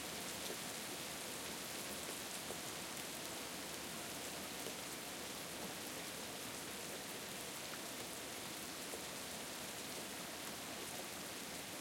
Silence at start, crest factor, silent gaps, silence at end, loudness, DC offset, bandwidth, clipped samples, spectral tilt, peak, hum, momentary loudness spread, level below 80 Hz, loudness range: 0 s; 22 dB; none; 0 s; -45 LUFS; under 0.1%; 17 kHz; under 0.1%; -1.5 dB/octave; -26 dBFS; none; 2 LU; -74 dBFS; 1 LU